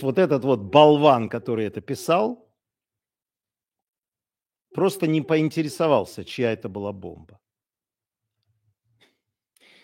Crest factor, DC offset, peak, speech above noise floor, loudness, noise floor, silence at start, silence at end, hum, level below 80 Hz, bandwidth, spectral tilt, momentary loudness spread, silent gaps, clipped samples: 24 dB; under 0.1%; 0 dBFS; over 69 dB; -21 LUFS; under -90 dBFS; 0 s; 2.7 s; none; -66 dBFS; 16.5 kHz; -6.5 dB/octave; 18 LU; 3.98-4.02 s; under 0.1%